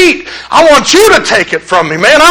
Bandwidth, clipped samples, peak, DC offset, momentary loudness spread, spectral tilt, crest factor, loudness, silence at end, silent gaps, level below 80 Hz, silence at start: over 20 kHz; 6%; 0 dBFS; under 0.1%; 6 LU; -2.5 dB/octave; 6 dB; -6 LUFS; 0 s; none; -36 dBFS; 0 s